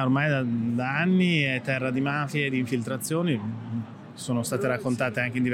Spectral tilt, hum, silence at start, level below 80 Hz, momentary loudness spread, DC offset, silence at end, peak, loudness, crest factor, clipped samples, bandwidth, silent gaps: -6 dB/octave; none; 0 s; -66 dBFS; 10 LU; under 0.1%; 0 s; -10 dBFS; -26 LUFS; 16 dB; under 0.1%; 16 kHz; none